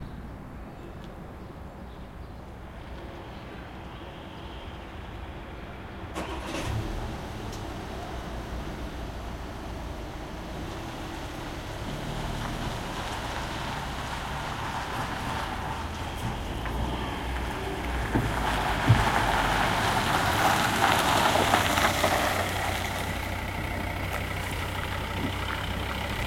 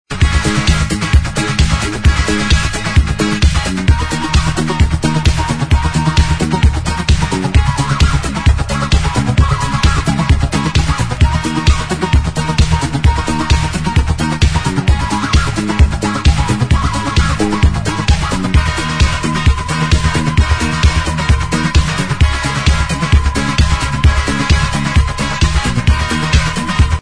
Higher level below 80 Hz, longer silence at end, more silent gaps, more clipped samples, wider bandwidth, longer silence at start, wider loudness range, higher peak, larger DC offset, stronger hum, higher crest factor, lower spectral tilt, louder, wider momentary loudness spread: second, -40 dBFS vs -16 dBFS; about the same, 0 s vs 0 s; neither; neither; first, 16.5 kHz vs 10.5 kHz; about the same, 0 s vs 0.1 s; first, 17 LU vs 1 LU; second, -4 dBFS vs 0 dBFS; neither; neither; first, 26 dB vs 12 dB; about the same, -4.5 dB/octave vs -5 dB/octave; second, -29 LUFS vs -14 LUFS; first, 18 LU vs 2 LU